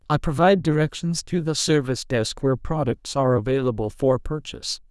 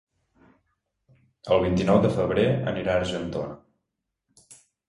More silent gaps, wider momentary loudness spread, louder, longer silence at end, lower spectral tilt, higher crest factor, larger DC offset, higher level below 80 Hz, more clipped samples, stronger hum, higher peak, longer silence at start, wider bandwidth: neither; second, 8 LU vs 12 LU; about the same, -23 LUFS vs -24 LUFS; second, 0.15 s vs 0.35 s; second, -5.5 dB/octave vs -7 dB/octave; second, 16 dB vs 22 dB; neither; first, -40 dBFS vs -48 dBFS; neither; neither; about the same, -6 dBFS vs -4 dBFS; second, 0.1 s vs 1.45 s; about the same, 12 kHz vs 11.5 kHz